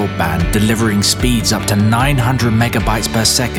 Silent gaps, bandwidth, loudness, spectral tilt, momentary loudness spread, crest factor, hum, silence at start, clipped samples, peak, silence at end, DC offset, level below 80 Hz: none; 17.5 kHz; -14 LUFS; -4.5 dB/octave; 3 LU; 12 dB; none; 0 s; under 0.1%; 0 dBFS; 0 s; 0.3%; -26 dBFS